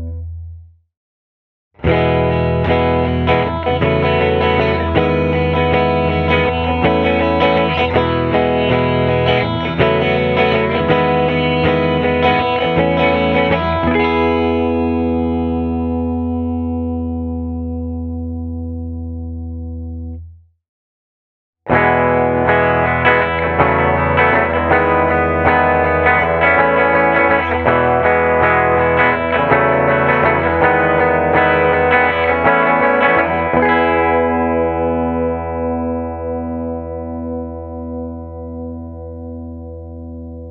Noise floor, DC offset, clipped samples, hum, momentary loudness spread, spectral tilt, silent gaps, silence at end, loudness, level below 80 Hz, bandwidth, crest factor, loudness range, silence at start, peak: -37 dBFS; under 0.1%; under 0.1%; none; 14 LU; -8.5 dB/octave; 0.97-1.71 s, 20.69-21.53 s; 0 s; -14 LUFS; -32 dBFS; 6 kHz; 16 dB; 11 LU; 0 s; 0 dBFS